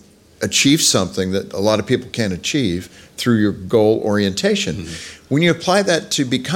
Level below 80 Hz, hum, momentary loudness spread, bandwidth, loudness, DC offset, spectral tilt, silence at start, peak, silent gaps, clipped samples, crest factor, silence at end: -50 dBFS; none; 10 LU; 17 kHz; -17 LUFS; under 0.1%; -4 dB/octave; 0.4 s; -2 dBFS; none; under 0.1%; 16 dB; 0 s